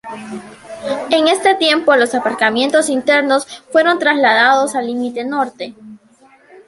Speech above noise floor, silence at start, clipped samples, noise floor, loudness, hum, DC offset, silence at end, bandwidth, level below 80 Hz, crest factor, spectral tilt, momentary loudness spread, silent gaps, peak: 34 dB; 0.05 s; under 0.1%; -49 dBFS; -14 LUFS; none; under 0.1%; 0.7 s; 11.5 kHz; -64 dBFS; 14 dB; -2.5 dB/octave; 17 LU; none; 0 dBFS